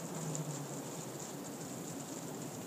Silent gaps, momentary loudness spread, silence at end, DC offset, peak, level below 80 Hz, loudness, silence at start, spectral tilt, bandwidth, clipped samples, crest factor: none; 4 LU; 0 s; under 0.1%; -24 dBFS; -80 dBFS; -43 LUFS; 0 s; -4.5 dB/octave; 15.5 kHz; under 0.1%; 20 dB